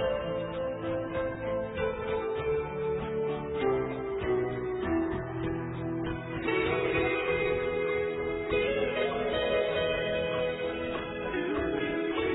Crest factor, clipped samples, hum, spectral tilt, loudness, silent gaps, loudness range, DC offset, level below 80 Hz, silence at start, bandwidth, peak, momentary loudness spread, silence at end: 14 dB; under 0.1%; none; -9.5 dB/octave; -31 LUFS; none; 3 LU; under 0.1%; -50 dBFS; 0 s; 4.1 kHz; -16 dBFS; 6 LU; 0 s